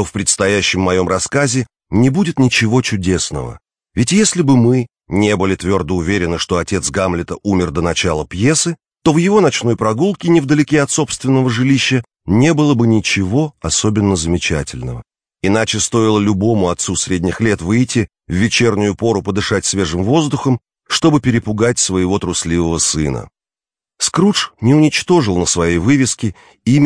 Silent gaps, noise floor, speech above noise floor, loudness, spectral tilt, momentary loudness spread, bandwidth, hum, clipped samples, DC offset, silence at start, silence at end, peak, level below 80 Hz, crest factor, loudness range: none; under -90 dBFS; over 76 dB; -15 LUFS; -4.5 dB/octave; 7 LU; 10.5 kHz; none; under 0.1%; under 0.1%; 0 s; 0 s; 0 dBFS; -38 dBFS; 14 dB; 2 LU